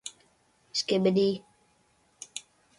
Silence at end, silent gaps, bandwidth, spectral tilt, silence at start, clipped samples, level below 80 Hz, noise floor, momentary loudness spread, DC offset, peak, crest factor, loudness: 0.4 s; none; 11.5 kHz; -5 dB/octave; 0.05 s; under 0.1%; -72 dBFS; -67 dBFS; 18 LU; under 0.1%; -12 dBFS; 18 dB; -27 LUFS